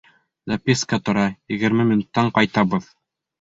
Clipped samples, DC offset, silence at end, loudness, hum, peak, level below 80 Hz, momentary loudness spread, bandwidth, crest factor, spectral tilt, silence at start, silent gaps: under 0.1%; under 0.1%; 0.6 s; -20 LUFS; none; -2 dBFS; -54 dBFS; 7 LU; 8 kHz; 20 dB; -5.5 dB/octave; 0.45 s; none